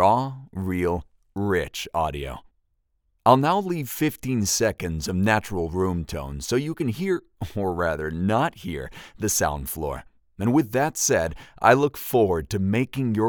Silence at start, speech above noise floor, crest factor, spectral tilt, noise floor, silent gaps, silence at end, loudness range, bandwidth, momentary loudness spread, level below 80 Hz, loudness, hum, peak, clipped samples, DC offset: 0 s; 47 dB; 22 dB; -5 dB/octave; -70 dBFS; none; 0 s; 4 LU; over 20 kHz; 13 LU; -46 dBFS; -24 LUFS; none; -2 dBFS; under 0.1%; under 0.1%